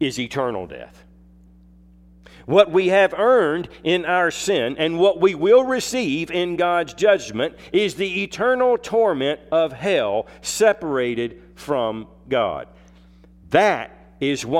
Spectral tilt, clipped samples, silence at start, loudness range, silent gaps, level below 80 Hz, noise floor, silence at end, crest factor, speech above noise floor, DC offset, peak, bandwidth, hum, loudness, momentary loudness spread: -4.5 dB/octave; under 0.1%; 0 s; 5 LU; none; -52 dBFS; -49 dBFS; 0 s; 20 dB; 30 dB; under 0.1%; 0 dBFS; 15 kHz; none; -20 LUFS; 10 LU